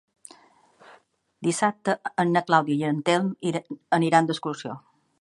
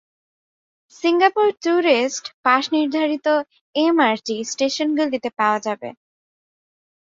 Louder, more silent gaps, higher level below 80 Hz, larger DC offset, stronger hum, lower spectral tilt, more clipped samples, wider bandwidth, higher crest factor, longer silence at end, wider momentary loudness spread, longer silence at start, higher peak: second, -24 LUFS vs -19 LUFS; second, none vs 2.34-2.43 s, 3.61-3.73 s; about the same, -74 dBFS vs -70 dBFS; neither; neither; first, -5 dB/octave vs -3 dB/octave; neither; first, 11.5 kHz vs 7.8 kHz; about the same, 22 dB vs 20 dB; second, 0.4 s vs 1.15 s; first, 12 LU vs 8 LU; first, 1.4 s vs 1 s; about the same, -4 dBFS vs -2 dBFS